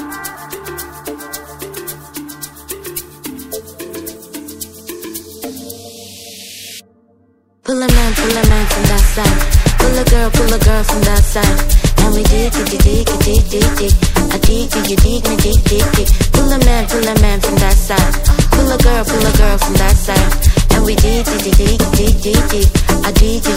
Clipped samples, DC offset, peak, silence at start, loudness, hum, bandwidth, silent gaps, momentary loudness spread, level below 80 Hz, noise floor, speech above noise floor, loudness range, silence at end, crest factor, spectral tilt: 0.5%; under 0.1%; 0 dBFS; 0 s; -13 LUFS; none; 16.5 kHz; none; 16 LU; -14 dBFS; -54 dBFS; 44 dB; 14 LU; 0 s; 12 dB; -4.5 dB/octave